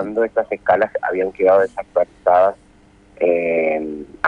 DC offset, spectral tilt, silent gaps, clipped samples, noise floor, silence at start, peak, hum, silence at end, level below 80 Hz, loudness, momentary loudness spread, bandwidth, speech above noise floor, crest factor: under 0.1%; -7 dB/octave; none; under 0.1%; -50 dBFS; 0 s; -2 dBFS; none; 0 s; -54 dBFS; -18 LUFS; 7 LU; 7.2 kHz; 32 dB; 16 dB